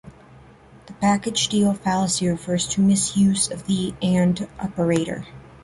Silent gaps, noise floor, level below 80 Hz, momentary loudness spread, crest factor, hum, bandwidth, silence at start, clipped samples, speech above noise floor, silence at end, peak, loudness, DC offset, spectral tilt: none; -48 dBFS; -50 dBFS; 7 LU; 16 dB; none; 11.5 kHz; 0.05 s; under 0.1%; 27 dB; 0.05 s; -6 dBFS; -21 LUFS; under 0.1%; -4.5 dB/octave